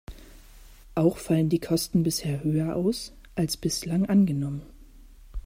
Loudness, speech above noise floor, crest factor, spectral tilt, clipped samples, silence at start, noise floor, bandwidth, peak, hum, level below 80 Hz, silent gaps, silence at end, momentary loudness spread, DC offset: -26 LUFS; 24 dB; 18 dB; -6 dB/octave; under 0.1%; 0.1 s; -49 dBFS; 16 kHz; -10 dBFS; none; -46 dBFS; none; 0.05 s; 12 LU; under 0.1%